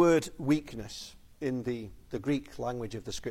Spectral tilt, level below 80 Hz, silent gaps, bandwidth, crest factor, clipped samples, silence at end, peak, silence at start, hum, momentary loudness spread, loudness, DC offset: -6 dB/octave; -54 dBFS; none; 16 kHz; 18 dB; under 0.1%; 0 s; -12 dBFS; 0 s; none; 12 LU; -33 LUFS; under 0.1%